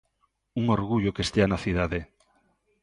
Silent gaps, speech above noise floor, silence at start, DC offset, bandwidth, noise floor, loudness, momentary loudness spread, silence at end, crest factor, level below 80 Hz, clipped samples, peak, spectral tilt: none; 48 dB; 0.55 s; under 0.1%; 11.5 kHz; -73 dBFS; -26 LUFS; 7 LU; 0.8 s; 22 dB; -44 dBFS; under 0.1%; -6 dBFS; -6.5 dB/octave